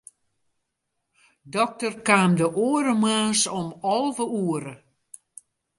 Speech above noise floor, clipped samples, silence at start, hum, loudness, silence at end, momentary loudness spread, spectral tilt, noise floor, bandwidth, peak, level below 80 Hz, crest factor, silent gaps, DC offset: 56 dB; under 0.1%; 1.45 s; none; -23 LUFS; 1.05 s; 12 LU; -4 dB/octave; -79 dBFS; 11.5 kHz; -4 dBFS; -68 dBFS; 22 dB; none; under 0.1%